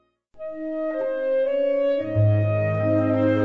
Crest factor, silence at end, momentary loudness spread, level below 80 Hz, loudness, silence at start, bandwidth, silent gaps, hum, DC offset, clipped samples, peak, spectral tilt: 14 dB; 0 s; 10 LU; -56 dBFS; -23 LUFS; 0.4 s; 4.5 kHz; none; none; 0.3%; under 0.1%; -8 dBFS; -10.5 dB/octave